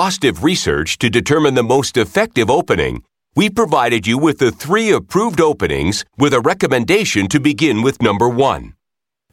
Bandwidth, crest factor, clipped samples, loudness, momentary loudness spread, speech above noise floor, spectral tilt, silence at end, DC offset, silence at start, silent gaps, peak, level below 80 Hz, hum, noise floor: 16.5 kHz; 14 dB; under 0.1%; -15 LUFS; 4 LU; 69 dB; -4.5 dB/octave; 0.6 s; under 0.1%; 0 s; none; -2 dBFS; -42 dBFS; none; -83 dBFS